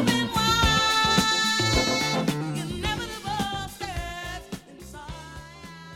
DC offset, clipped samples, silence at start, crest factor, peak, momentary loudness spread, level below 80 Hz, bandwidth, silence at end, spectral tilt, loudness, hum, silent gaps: under 0.1%; under 0.1%; 0 s; 18 dB; -8 dBFS; 21 LU; -38 dBFS; 17.5 kHz; 0 s; -3 dB/octave; -24 LUFS; none; none